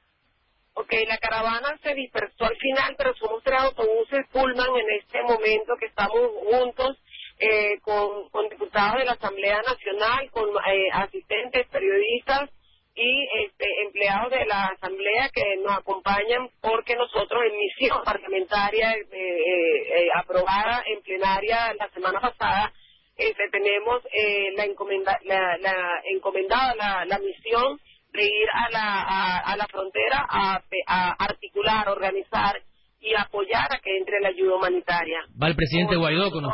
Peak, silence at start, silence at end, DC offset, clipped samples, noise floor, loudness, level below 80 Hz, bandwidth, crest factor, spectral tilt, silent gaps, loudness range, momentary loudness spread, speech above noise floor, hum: -10 dBFS; 0.75 s; 0 s; under 0.1%; under 0.1%; -68 dBFS; -24 LUFS; -50 dBFS; 5.8 kHz; 16 dB; -8.5 dB/octave; none; 1 LU; 6 LU; 44 dB; none